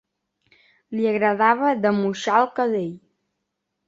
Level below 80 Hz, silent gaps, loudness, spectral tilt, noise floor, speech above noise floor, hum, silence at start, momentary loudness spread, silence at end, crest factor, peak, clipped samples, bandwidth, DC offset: -70 dBFS; none; -21 LUFS; -6 dB/octave; -78 dBFS; 58 dB; none; 0.9 s; 9 LU; 0.9 s; 20 dB; -4 dBFS; under 0.1%; 7.8 kHz; under 0.1%